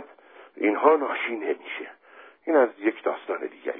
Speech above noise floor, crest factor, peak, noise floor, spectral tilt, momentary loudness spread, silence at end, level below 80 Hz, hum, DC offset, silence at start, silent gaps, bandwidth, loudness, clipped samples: 27 dB; 22 dB; -4 dBFS; -51 dBFS; -7.5 dB/octave; 15 LU; 0 s; under -90 dBFS; none; under 0.1%; 0 s; none; 3.8 kHz; -25 LUFS; under 0.1%